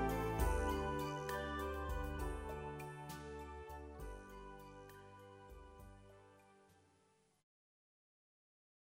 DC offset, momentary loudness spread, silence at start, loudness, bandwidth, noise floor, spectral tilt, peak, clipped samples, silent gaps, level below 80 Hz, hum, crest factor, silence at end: under 0.1%; 20 LU; 0 s; -44 LUFS; 16 kHz; -75 dBFS; -6 dB/octave; -22 dBFS; under 0.1%; none; -50 dBFS; 50 Hz at -80 dBFS; 22 dB; 2.1 s